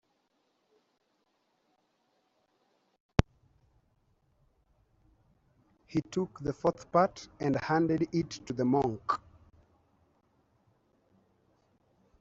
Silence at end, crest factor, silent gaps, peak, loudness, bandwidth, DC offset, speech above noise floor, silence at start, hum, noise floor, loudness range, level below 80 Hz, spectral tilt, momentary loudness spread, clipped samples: 3.05 s; 32 dB; none; -4 dBFS; -31 LUFS; 7.8 kHz; under 0.1%; 46 dB; 3.2 s; none; -76 dBFS; 10 LU; -52 dBFS; -6.5 dB/octave; 8 LU; under 0.1%